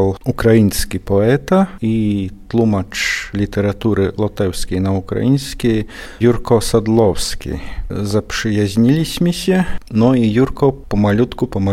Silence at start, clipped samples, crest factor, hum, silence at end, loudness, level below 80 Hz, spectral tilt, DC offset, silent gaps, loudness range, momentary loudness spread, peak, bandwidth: 0 s; under 0.1%; 14 dB; none; 0 s; -16 LUFS; -32 dBFS; -6 dB/octave; under 0.1%; none; 2 LU; 7 LU; 0 dBFS; 16 kHz